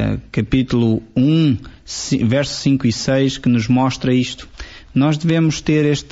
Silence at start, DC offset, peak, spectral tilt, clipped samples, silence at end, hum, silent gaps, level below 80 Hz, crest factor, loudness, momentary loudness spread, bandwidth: 0 s; under 0.1%; -4 dBFS; -6 dB/octave; under 0.1%; 0.1 s; none; none; -40 dBFS; 12 dB; -17 LUFS; 9 LU; 8 kHz